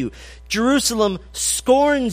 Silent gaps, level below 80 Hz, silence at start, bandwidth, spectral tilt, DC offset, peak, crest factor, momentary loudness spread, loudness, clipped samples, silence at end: none; -42 dBFS; 0 s; 15.5 kHz; -3 dB/octave; under 0.1%; -4 dBFS; 14 dB; 8 LU; -18 LUFS; under 0.1%; 0 s